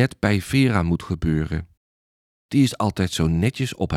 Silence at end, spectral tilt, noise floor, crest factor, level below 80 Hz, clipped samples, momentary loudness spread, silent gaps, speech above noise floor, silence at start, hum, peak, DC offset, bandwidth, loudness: 0 s; -6 dB/octave; under -90 dBFS; 16 dB; -40 dBFS; under 0.1%; 6 LU; 1.77-2.49 s; over 69 dB; 0 s; none; -6 dBFS; under 0.1%; 15 kHz; -22 LUFS